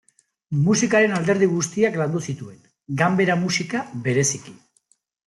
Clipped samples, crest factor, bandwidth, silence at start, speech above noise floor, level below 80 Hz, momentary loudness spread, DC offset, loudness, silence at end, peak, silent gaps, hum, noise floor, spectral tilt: under 0.1%; 16 dB; 12 kHz; 0.5 s; 44 dB; -62 dBFS; 13 LU; under 0.1%; -21 LUFS; 0.7 s; -6 dBFS; none; none; -65 dBFS; -5 dB/octave